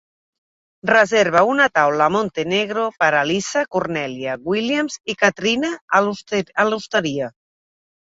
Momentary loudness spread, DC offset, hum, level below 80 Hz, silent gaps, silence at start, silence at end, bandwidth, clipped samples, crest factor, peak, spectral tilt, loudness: 9 LU; under 0.1%; none; -60 dBFS; 5.81-5.88 s; 0.85 s; 0.8 s; 8 kHz; under 0.1%; 18 dB; -2 dBFS; -4 dB/octave; -18 LUFS